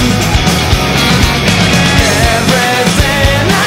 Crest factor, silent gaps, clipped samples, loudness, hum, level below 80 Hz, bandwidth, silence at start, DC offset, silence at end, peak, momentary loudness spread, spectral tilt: 10 dB; none; 0.1%; -9 LUFS; none; -18 dBFS; 16.5 kHz; 0 s; under 0.1%; 0 s; 0 dBFS; 2 LU; -4 dB/octave